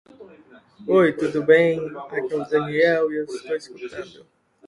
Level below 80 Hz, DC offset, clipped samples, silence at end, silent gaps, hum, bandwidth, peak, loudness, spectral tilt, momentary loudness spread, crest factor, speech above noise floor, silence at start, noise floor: -64 dBFS; under 0.1%; under 0.1%; 0.6 s; none; none; 11 kHz; -4 dBFS; -21 LUFS; -6.5 dB/octave; 18 LU; 20 dB; 28 dB; 0.2 s; -49 dBFS